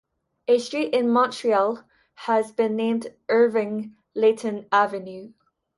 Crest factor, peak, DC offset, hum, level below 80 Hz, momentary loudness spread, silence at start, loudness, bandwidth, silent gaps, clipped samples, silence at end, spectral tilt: 18 dB; -6 dBFS; under 0.1%; none; -72 dBFS; 14 LU; 0.5 s; -23 LUFS; 11.5 kHz; none; under 0.1%; 0.5 s; -5 dB/octave